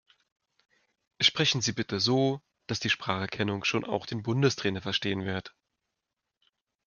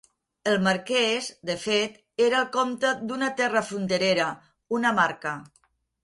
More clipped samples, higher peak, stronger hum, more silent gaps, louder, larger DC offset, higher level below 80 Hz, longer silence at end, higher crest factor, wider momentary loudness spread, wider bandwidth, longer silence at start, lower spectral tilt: neither; about the same, -8 dBFS vs -8 dBFS; neither; neither; second, -28 LUFS vs -25 LUFS; neither; about the same, -66 dBFS vs -68 dBFS; first, 1.35 s vs 0.55 s; about the same, 22 dB vs 18 dB; about the same, 8 LU vs 9 LU; second, 7.2 kHz vs 11.5 kHz; first, 1.2 s vs 0.45 s; about the same, -4 dB/octave vs -3.5 dB/octave